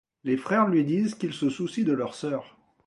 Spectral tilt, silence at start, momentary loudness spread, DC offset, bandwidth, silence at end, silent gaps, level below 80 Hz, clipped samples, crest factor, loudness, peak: -6.5 dB/octave; 0.25 s; 9 LU; under 0.1%; 11.5 kHz; 0.4 s; none; -70 dBFS; under 0.1%; 18 dB; -27 LUFS; -10 dBFS